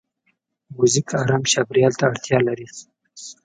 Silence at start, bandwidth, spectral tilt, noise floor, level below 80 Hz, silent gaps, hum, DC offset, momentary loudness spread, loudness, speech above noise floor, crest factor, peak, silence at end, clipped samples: 0.7 s; 9.4 kHz; -4 dB/octave; -69 dBFS; -60 dBFS; none; none; under 0.1%; 20 LU; -19 LUFS; 50 dB; 18 dB; -2 dBFS; 0.1 s; under 0.1%